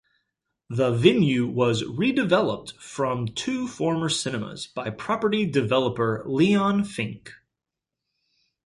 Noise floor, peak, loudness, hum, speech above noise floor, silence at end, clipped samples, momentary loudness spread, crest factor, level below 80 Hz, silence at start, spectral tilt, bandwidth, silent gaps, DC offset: -86 dBFS; -2 dBFS; -24 LUFS; none; 63 dB; 1.3 s; under 0.1%; 12 LU; 22 dB; -58 dBFS; 0.7 s; -5.5 dB/octave; 11.5 kHz; none; under 0.1%